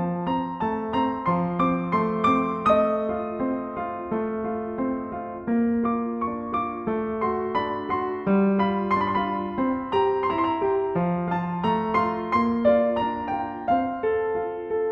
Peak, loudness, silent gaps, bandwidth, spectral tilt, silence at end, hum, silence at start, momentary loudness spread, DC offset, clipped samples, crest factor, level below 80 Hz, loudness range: -8 dBFS; -25 LUFS; none; 6.8 kHz; -9 dB/octave; 0 s; none; 0 s; 7 LU; under 0.1%; under 0.1%; 16 dB; -52 dBFS; 3 LU